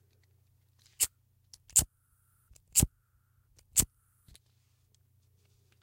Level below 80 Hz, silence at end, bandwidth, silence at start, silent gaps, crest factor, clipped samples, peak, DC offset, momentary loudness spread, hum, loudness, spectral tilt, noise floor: -50 dBFS; 1.95 s; 16.5 kHz; 1 s; none; 28 dB; under 0.1%; -8 dBFS; under 0.1%; 9 LU; none; -29 LUFS; -2 dB/octave; -71 dBFS